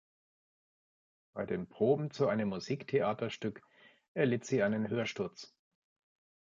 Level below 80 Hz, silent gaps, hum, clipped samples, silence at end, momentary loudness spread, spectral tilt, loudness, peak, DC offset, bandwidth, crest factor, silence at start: -72 dBFS; 4.08-4.15 s; none; under 0.1%; 1.1 s; 12 LU; -6.5 dB/octave; -34 LUFS; -16 dBFS; under 0.1%; 7.8 kHz; 20 dB; 1.35 s